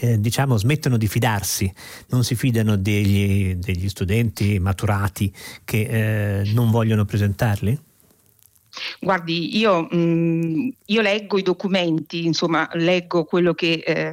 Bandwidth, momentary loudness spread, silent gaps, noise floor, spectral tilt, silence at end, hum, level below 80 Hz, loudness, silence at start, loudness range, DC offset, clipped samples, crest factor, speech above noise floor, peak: 16.5 kHz; 6 LU; none; -57 dBFS; -6 dB/octave; 0 s; none; -50 dBFS; -21 LUFS; 0 s; 2 LU; under 0.1%; under 0.1%; 12 dB; 37 dB; -8 dBFS